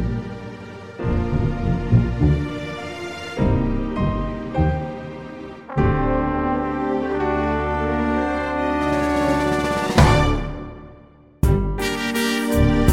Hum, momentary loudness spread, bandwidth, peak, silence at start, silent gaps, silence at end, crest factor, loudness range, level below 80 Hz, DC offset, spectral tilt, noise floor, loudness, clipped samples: none; 14 LU; 16 kHz; -2 dBFS; 0 s; none; 0 s; 20 dB; 3 LU; -28 dBFS; 0.3%; -6.5 dB/octave; -47 dBFS; -21 LUFS; under 0.1%